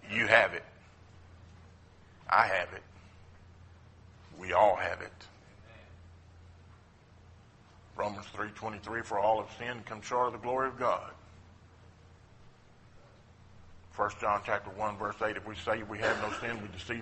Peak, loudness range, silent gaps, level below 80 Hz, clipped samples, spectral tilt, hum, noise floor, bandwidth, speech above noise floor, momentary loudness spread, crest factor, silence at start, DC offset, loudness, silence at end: -6 dBFS; 12 LU; none; -62 dBFS; under 0.1%; -4.5 dB/octave; none; -58 dBFS; 8.4 kHz; 26 dB; 22 LU; 28 dB; 0 s; under 0.1%; -32 LUFS; 0 s